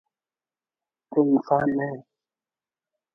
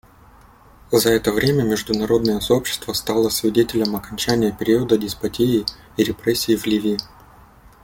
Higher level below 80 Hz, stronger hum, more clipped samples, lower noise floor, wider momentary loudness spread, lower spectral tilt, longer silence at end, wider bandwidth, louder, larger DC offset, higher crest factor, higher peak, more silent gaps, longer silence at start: second, -66 dBFS vs -46 dBFS; neither; neither; first, under -90 dBFS vs -48 dBFS; first, 11 LU vs 6 LU; first, -10.5 dB/octave vs -4.5 dB/octave; first, 1.15 s vs 0.8 s; second, 5.8 kHz vs 17 kHz; second, -24 LUFS vs -20 LUFS; neither; about the same, 20 dB vs 18 dB; second, -8 dBFS vs -2 dBFS; neither; first, 1.1 s vs 0.9 s